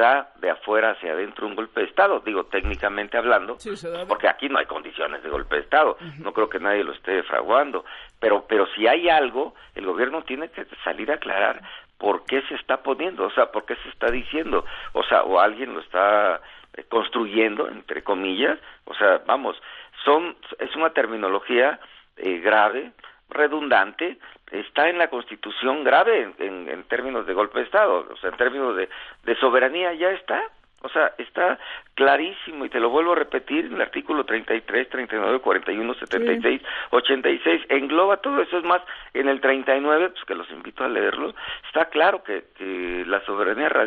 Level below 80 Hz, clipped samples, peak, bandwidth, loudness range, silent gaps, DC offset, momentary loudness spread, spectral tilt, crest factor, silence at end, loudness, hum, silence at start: -50 dBFS; under 0.1%; -4 dBFS; 7.8 kHz; 3 LU; none; under 0.1%; 12 LU; -5.5 dB/octave; 18 dB; 0 s; -22 LUFS; none; 0 s